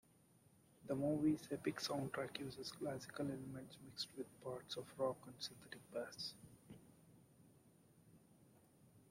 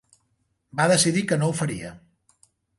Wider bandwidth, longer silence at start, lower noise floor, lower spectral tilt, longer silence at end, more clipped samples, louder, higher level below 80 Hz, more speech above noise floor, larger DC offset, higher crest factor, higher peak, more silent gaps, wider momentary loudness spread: first, 16 kHz vs 12 kHz; about the same, 0.8 s vs 0.75 s; about the same, -72 dBFS vs -72 dBFS; about the same, -5 dB/octave vs -4 dB/octave; second, 0.1 s vs 0.8 s; neither; second, -46 LUFS vs -22 LUFS; second, -78 dBFS vs -60 dBFS; second, 26 dB vs 49 dB; neither; about the same, 20 dB vs 20 dB; second, -28 dBFS vs -6 dBFS; neither; about the same, 17 LU vs 16 LU